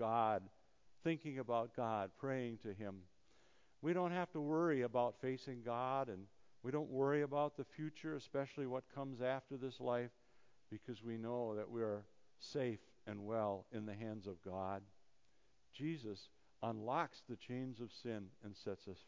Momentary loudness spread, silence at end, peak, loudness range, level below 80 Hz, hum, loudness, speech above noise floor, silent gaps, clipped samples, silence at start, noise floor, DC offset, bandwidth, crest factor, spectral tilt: 13 LU; 0.05 s; -24 dBFS; 6 LU; -78 dBFS; none; -44 LUFS; 36 dB; none; under 0.1%; 0 s; -79 dBFS; under 0.1%; 7.6 kHz; 20 dB; -7.5 dB/octave